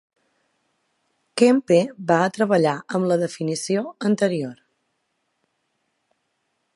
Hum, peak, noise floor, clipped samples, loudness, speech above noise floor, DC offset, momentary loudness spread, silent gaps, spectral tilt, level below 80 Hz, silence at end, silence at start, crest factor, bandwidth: none; -2 dBFS; -73 dBFS; under 0.1%; -21 LUFS; 53 dB; under 0.1%; 8 LU; none; -5.5 dB/octave; -72 dBFS; 2.25 s; 1.35 s; 20 dB; 11.5 kHz